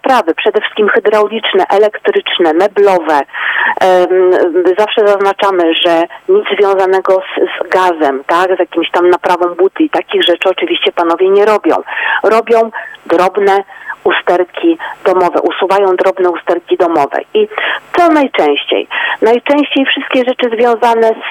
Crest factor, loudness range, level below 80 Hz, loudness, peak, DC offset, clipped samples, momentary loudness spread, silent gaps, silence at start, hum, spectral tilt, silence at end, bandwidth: 10 dB; 2 LU; -62 dBFS; -11 LUFS; 0 dBFS; under 0.1%; under 0.1%; 5 LU; none; 0.05 s; none; -4.5 dB/octave; 0 s; 13.5 kHz